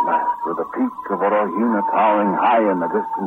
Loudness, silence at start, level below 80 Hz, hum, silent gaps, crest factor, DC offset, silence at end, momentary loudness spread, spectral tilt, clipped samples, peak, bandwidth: -19 LUFS; 0 s; -64 dBFS; none; none; 14 dB; under 0.1%; 0 s; 7 LU; -8.5 dB/octave; under 0.1%; -6 dBFS; 4.1 kHz